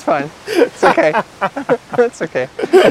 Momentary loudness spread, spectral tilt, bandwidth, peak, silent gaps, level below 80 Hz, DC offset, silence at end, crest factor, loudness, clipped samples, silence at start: 9 LU; -5 dB/octave; 14 kHz; 0 dBFS; none; -54 dBFS; under 0.1%; 0 s; 14 dB; -15 LUFS; 0.2%; 0 s